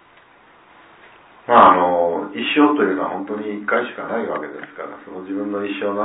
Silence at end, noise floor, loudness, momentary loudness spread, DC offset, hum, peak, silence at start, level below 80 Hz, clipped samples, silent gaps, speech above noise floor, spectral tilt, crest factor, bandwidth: 0 s; -50 dBFS; -18 LUFS; 21 LU; under 0.1%; none; 0 dBFS; 1.5 s; -60 dBFS; under 0.1%; none; 32 dB; -8.5 dB/octave; 20 dB; 4 kHz